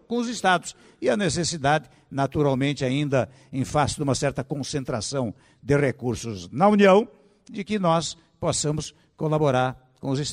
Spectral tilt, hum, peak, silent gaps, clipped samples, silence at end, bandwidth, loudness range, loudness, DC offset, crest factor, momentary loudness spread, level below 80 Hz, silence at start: -5 dB/octave; none; -6 dBFS; none; under 0.1%; 0 s; 12.5 kHz; 3 LU; -24 LUFS; under 0.1%; 18 dB; 12 LU; -50 dBFS; 0.1 s